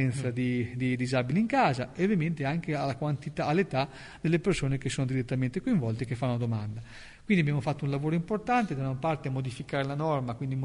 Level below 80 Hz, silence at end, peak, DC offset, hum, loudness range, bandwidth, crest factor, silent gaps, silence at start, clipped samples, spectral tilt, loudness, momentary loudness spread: -54 dBFS; 0 s; -12 dBFS; under 0.1%; none; 2 LU; 10.5 kHz; 16 dB; none; 0 s; under 0.1%; -7 dB/octave; -30 LUFS; 6 LU